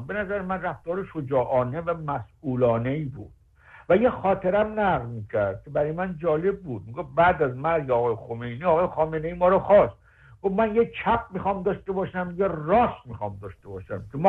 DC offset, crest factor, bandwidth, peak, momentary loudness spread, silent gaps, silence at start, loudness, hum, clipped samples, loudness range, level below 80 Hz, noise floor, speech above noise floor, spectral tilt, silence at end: under 0.1%; 18 dB; 4.3 kHz; -6 dBFS; 13 LU; none; 0 s; -25 LUFS; none; under 0.1%; 4 LU; -50 dBFS; -52 dBFS; 28 dB; -9.5 dB/octave; 0 s